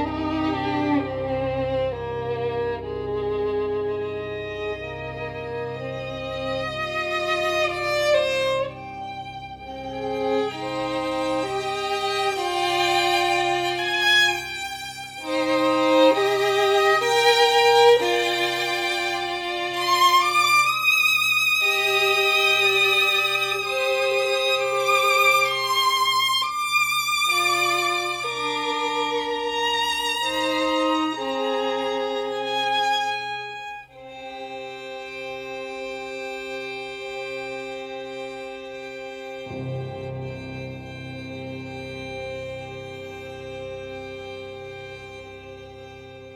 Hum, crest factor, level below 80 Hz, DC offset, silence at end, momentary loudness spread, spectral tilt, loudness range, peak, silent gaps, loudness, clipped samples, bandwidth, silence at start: none; 20 dB; -54 dBFS; under 0.1%; 0 s; 18 LU; -3 dB/octave; 16 LU; -4 dBFS; none; -21 LUFS; under 0.1%; 18 kHz; 0 s